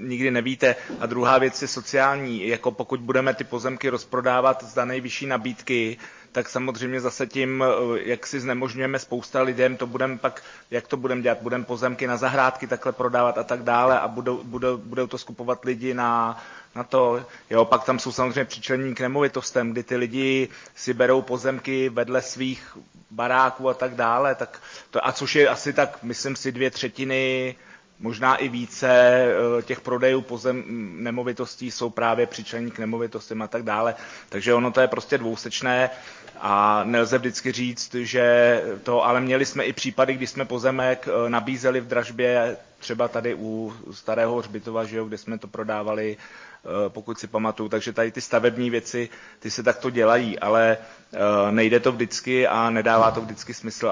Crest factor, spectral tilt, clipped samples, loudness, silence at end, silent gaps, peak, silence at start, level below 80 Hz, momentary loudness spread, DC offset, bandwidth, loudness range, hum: 18 dB; -4.5 dB/octave; under 0.1%; -23 LUFS; 0 s; none; -6 dBFS; 0 s; -64 dBFS; 12 LU; under 0.1%; 7.6 kHz; 5 LU; none